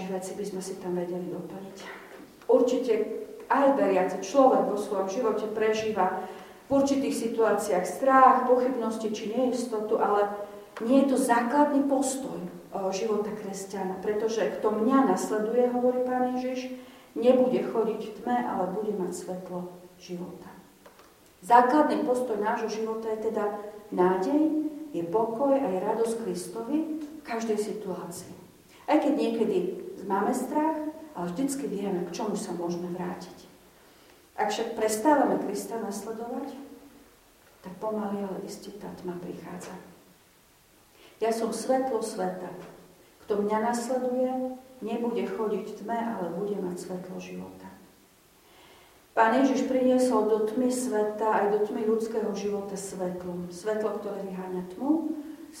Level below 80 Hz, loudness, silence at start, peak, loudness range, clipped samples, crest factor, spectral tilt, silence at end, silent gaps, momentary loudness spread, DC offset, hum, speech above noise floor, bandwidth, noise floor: -68 dBFS; -27 LUFS; 0 s; -6 dBFS; 9 LU; under 0.1%; 22 dB; -5.5 dB/octave; 0 s; none; 16 LU; under 0.1%; none; 33 dB; 16.5 kHz; -60 dBFS